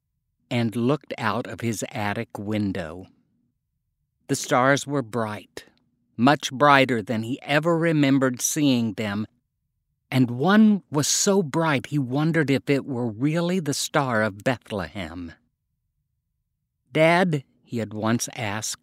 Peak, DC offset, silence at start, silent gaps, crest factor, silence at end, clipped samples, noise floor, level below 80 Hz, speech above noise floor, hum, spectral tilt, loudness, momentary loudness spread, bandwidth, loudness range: 0 dBFS; under 0.1%; 0.5 s; none; 24 dB; 0.05 s; under 0.1%; -77 dBFS; -62 dBFS; 55 dB; none; -4.5 dB/octave; -23 LUFS; 13 LU; 16 kHz; 7 LU